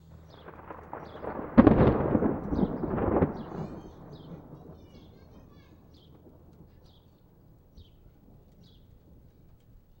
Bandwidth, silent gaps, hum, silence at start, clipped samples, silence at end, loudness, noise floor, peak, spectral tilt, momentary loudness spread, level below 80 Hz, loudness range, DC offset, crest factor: 16 kHz; none; none; 0.45 s; under 0.1%; 2.2 s; -26 LUFS; -58 dBFS; -2 dBFS; -10.5 dB/octave; 28 LU; -44 dBFS; 24 LU; under 0.1%; 30 dB